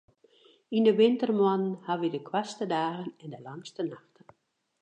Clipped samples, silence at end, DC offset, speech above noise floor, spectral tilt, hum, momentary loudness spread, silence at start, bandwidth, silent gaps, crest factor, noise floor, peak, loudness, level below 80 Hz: under 0.1%; 0.85 s; under 0.1%; 47 dB; -6.5 dB/octave; none; 19 LU; 0.7 s; 9.2 kHz; none; 18 dB; -75 dBFS; -12 dBFS; -28 LUFS; -84 dBFS